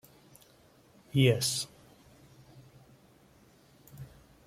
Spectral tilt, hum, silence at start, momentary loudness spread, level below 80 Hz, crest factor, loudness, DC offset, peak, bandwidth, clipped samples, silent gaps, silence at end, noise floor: -4.5 dB/octave; none; 1.15 s; 26 LU; -66 dBFS; 22 dB; -29 LUFS; under 0.1%; -12 dBFS; 15.5 kHz; under 0.1%; none; 0.4 s; -61 dBFS